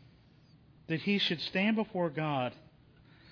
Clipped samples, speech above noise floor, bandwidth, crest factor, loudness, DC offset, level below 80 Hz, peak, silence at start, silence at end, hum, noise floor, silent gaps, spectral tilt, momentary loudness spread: under 0.1%; 29 dB; 5.4 kHz; 18 dB; -32 LUFS; under 0.1%; -70 dBFS; -18 dBFS; 0.9 s; 0.75 s; none; -61 dBFS; none; -6.5 dB/octave; 6 LU